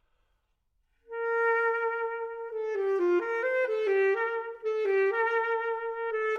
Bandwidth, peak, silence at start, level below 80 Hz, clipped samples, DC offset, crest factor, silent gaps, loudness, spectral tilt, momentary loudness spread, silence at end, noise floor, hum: 6.8 kHz; -18 dBFS; 1.1 s; -74 dBFS; under 0.1%; under 0.1%; 12 dB; none; -29 LUFS; -3.5 dB/octave; 8 LU; 0 s; -74 dBFS; none